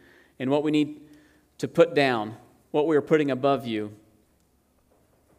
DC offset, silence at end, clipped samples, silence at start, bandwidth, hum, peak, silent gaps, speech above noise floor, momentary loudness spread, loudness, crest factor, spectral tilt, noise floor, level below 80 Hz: under 0.1%; 1.45 s; under 0.1%; 0.4 s; 15 kHz; none; -6 dBFS; none; 42 dB; 14 LU; -25 LUFS; 20 dB; -6.5 dB/octave; -65 dBFS; -70 dBFS